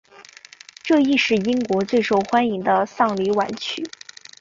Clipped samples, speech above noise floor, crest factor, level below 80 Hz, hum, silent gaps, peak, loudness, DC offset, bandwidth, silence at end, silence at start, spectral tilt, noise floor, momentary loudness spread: under 0.1%; 26 dB; 16 dB; -62 dBFS; none; none; -4 dBFS; -20 LUFS; under 0.1%; 7.8 kHz; 0.55 s; 0.2 s; -5 dB/octave; -45 dBFS; 14 LU